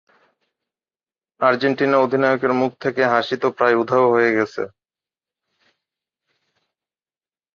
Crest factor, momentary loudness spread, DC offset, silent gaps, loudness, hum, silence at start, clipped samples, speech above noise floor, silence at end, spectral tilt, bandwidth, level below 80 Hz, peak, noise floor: 20 dB; 6 LU; under 0.1%; none; -18 LUFS; none; 1.4 s; under 0.1%; over 72 dB; 2.9 s; -6.5 dB/octave; 7 kHz; -68 dBFS; -2 dBFS; under -90 dBFS